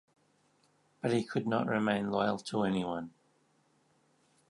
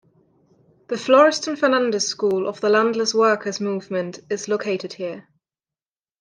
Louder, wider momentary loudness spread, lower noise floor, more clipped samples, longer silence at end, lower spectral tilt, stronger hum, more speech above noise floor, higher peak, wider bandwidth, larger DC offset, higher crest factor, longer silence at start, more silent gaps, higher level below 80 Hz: second, -33 LUFS vs -20 LUFS; second, 8 LU vs 14 LU; second, -71 dBFS vs under -90 dBFS; neither; first, 1.4 s vs 1 s; first, -6.5 dB/octave vs -3.5 dB/octave; neither; second, 39 dB vs over 70 dB; second, -14 dBFS vs -2 dBFS; first, 11.5 kHz vs 10 kHz; neither; about the same, 22 dB vs 18 dB; first, 1.05 s vs 0.9 s; neither; about the same, -70 dBFS vs -74 dBFS